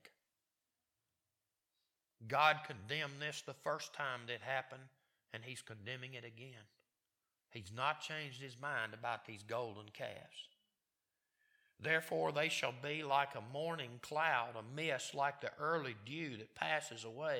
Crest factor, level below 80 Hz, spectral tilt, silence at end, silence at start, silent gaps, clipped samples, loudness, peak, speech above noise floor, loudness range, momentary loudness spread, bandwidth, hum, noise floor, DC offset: 26 dB; -88 dBFS; -3.5 dB/octave; 0 s; 0.05 s; none; under 0.1%; -40 LUFS; -16 dBFS; over 49 dB; 8 LU; 16 LU; 18 kHz; none; under -90 dBFS; under 0.1%